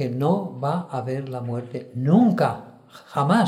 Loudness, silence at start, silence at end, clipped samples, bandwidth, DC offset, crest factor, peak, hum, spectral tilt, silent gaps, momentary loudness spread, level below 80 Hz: -23 LUFS; 0 s; 0 s; under 0.1%; 13.5 kHz; under 0.1%; 18 dB; -6 dBFS; none; -8 dB/octave; none; 13 LU; -68 dBFS